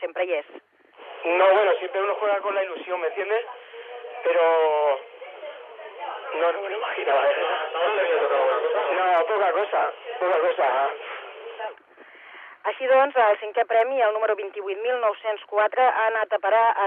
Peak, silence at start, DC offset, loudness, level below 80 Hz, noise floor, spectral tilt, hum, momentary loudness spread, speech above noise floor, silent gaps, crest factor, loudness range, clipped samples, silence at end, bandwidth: -8 dBFS; 0 s; under 0.1%; -23 LUFS; under -90 dBFS; -49 dBFS; -3.5 dB/octave; none; 18 LU; 27 dB; none; 16 dB; 3 LU; under 0.1%; 0 s; 4 kHz